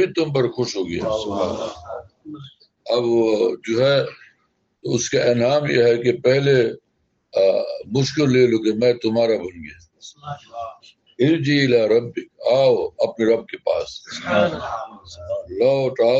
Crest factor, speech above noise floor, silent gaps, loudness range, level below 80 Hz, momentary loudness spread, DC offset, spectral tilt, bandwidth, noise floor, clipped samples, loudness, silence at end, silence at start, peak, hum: 16 dB; 49 dB; none; 3 LU; -58 dBFS; 18 LU; under 0.1%; -5.5 dB/octave; 8 kHz; -69 dBFS; under 0.1%; -19 LUFS; 0 s; 0 s; -4 dBFS; none